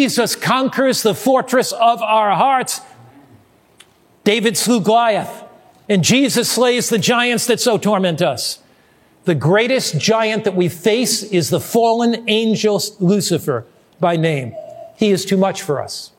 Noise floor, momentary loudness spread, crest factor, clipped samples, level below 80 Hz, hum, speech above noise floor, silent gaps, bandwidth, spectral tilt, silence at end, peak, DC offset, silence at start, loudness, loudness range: -52 dBFS; 8 LU; 16 dB; under 0.1%; -64 dBFS; none; 37 dB; none; 17 kHz; -4 dB/octave; 0.1 s; 0 dBFS; under 0.1%; 0 s; -16 LUFS; 3 LU